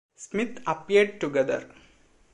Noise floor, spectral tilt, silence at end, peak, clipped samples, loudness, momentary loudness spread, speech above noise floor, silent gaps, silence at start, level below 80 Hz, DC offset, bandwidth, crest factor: -59 dBFS; -5 dB/octave; 0.65 s; -8 dBFS; under 0.1%; -26 LUFS; 10 LU; 33 dB; none; 0.2 s; -66 dBFS; under 0.1%; 10.5 kHz; 20 dB